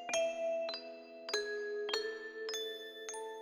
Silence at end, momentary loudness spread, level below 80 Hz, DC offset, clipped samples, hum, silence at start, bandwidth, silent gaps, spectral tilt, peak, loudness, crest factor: 0 s; 9 LU; -80 dBFS; under 0.1%; under 0.1%; none; 0 s; 18.5 kHz; none; 0.5 dB/octave; -20 dBFS; -39 LUFS; 20 dB